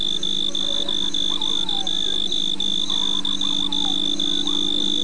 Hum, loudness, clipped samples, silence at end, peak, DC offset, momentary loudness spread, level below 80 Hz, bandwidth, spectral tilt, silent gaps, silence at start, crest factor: 50 Hz at -55 dBFS; -20 LUFS; under 0.1%; 0 s; -10 dBFS; 6%; 1 LU; -54 dBFS; 10.5 kHz; -2 dB/octave; none; 0 s; 12 dB